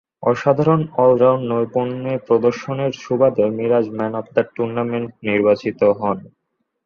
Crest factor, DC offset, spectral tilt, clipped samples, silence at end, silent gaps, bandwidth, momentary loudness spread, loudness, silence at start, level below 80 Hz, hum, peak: 16 dB; under 0.1%; -8 dB/octave; under 0.1%; 0.6 s; none; 6.8 kHz; 8 LU; -18 LUFS; 0.2 s; -58 dBFS; none; -2 dBFS